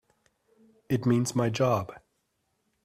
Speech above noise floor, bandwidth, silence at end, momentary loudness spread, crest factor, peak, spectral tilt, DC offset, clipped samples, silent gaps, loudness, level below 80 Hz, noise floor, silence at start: 50 dB; 15 kHz; 0.85 s; 6 LU; 16 dB; -14 dBFS; -6 dB/octave; under 0.1%; under 0.1%; none; -27 LUFS; -64 dBFS; -76 dBFS; 0.9 s